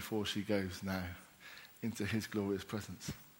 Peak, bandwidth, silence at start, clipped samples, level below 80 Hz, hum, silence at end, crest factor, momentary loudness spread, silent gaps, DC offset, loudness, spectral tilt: -20 dBFS; 16.5 kHz; 0 s; under 0.1%; -66 dBFS; none; 0 s; 20 dB; 16 LU; none; under 0.1%; -40 LUFS; -5 dB/octave